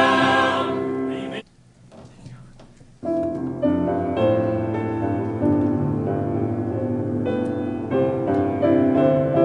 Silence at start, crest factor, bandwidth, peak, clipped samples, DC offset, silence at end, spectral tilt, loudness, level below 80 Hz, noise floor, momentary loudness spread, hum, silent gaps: 0 s; 18 dB; 10.5 kHz; -4 dBFS; under 0.1%; under 0.1%; 0 s; -7.5 dB/octave; -22 LUFS; -56 dBFS; -51 dBFS; 9 LU; none; none